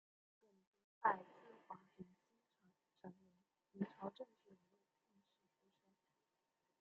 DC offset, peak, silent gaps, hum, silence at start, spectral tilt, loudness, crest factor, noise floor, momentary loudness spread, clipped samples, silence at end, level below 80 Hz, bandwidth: under 0.1%; -24 dBFS; none; none; 1 s; -5 dB/octave; -46 LUFS; 30 dB; -89 dBFS; 22 LU; under 0.1%; 2.25 s; under -90 dBFS; 7 kHz